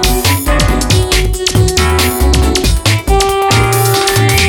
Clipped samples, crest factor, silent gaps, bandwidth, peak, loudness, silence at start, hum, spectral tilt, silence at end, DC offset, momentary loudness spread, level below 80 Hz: under 0.1%; 10 dB; none; over 20 kHz; 0 dBFS; -11 LUFS; 0 s; none; -4 dB/octave; 0 s; under 0.1%; 2 LU; -16 dBFS